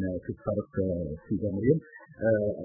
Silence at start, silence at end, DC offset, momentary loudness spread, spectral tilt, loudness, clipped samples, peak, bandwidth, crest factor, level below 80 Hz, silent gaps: 0 s; 0 s; under 0.1%; 8 LU; -15 dB/octave; -30 LUFS; under 0.1%; -10 dBFS; 2.2 kHz; 18 dB; -48 dBFS; none